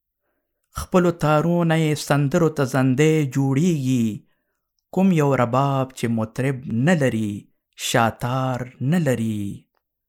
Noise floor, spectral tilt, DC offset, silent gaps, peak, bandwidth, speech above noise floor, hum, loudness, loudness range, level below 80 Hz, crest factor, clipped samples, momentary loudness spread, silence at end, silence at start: -75 dBFS; -6.5 dB/octave; under 0.1%; none; -2 dBFS; 16.5 kHz; 55 dB; none; -21 LUFS; 3 LU; -52 dBFS; 18 dB; under 0.1%; 10 LU; 0.5 s; 0.75 s